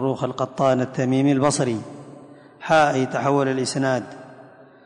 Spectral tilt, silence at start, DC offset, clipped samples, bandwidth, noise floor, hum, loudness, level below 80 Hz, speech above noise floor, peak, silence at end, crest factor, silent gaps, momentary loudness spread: -5.5 dB/octave; 0 s; under 0.1%; under 0.1%; 11 kHz; -46 dBFS; none; -21 LUFS; -62 dBFS; 26 dB; -6 dBFS; 0.4 s; 16 dB; none; 19 LU